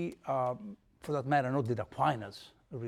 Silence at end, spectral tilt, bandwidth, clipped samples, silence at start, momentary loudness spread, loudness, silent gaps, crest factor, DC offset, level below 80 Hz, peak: 0 s; -7.5 dB/octave; 14 kHz; under 0.1%; 0 s; 17 LU; -33 LUFS; none; 18 dB; under 0.1%; -68 dBFS; -16 dBFS